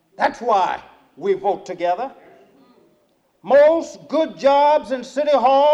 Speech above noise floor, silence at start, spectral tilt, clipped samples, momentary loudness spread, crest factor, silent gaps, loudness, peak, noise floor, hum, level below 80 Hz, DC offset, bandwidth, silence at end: 44 dB; 0.2 s; -4.5 dB/octave; under 0.1%; 12 LU; 14 dB; none; -18 LUFS; -4 dBFS; -62 dBFS; none; -62 dBFS; under 0.1%; 8.2 kHz; 0 s